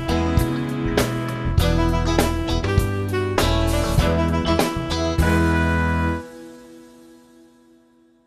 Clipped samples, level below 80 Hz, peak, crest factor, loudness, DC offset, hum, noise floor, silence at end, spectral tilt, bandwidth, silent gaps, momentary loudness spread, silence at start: under 0.1%; -28 dBFS; -2 dBFS; 18 dB; -21 LUFS; under 0.1%; 50 Hz at -50 dBFS; -56 dBFS; 1.4 s; -6 dB/octave; 14 kHz; none; 5 LU; 0 s